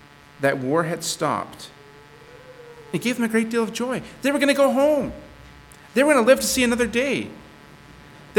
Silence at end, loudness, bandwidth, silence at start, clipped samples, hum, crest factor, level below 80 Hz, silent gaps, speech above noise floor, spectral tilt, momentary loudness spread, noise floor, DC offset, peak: 0 s; -21 LUFS; 19 kHz; 0.4 s; under 0.1%; none; 20 dB; -52 dBFS; none; 26 dB; -4 dB/octave; 14 LU; -46 dBFS; under 0.1%; -2 dBFS